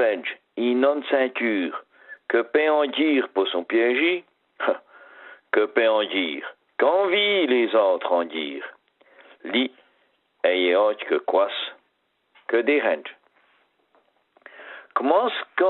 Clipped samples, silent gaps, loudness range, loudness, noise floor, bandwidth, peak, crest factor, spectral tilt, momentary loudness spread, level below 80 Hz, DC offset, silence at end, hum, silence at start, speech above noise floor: under 0.1%; none; 4 LU; -22 LUFS; -70 dBFS; 4.2 kHz; -4 dBFS; 18 dB; -7.5 dB/octave; 14 LU; -80 dBFS; under 0.1%; 0 s; none; 0 s; 49 dB